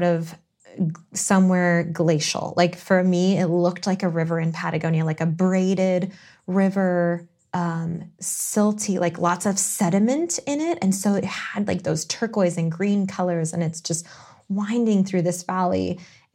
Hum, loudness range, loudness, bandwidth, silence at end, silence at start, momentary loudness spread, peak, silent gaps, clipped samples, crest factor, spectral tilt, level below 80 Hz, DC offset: none; 3 LU; -22 LUFS; 16 kHz; 0.3 s; 0 s; 8 LU; -4 dBFS; none; under 0.1%; 18 dB; -5.5 dB/octave; -66 dBFS; under 0.1%